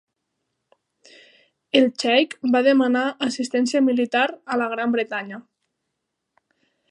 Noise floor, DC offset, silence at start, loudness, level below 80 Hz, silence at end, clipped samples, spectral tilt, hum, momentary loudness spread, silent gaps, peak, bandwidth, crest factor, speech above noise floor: -79 dBFS; under 0.1%; 1.75 s; -21 LUFS; -76 dBFS; 1.5 s; under 0.1%; -3.5 dB/octave; none; 8 LU; none; -2 dBFS; 11 kHz; 20 dB; 59 dB